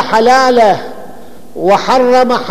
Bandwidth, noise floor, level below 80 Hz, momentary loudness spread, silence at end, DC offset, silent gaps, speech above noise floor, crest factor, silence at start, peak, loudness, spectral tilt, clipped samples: 15 kHz; -34 dBFS; -48 dBFS; 12 LU; 0 s; 5%; none; 26 dB; 10 dB; 0 s; 0 dBFS; -9 LUFS; -4 dB/octave; under 0.1%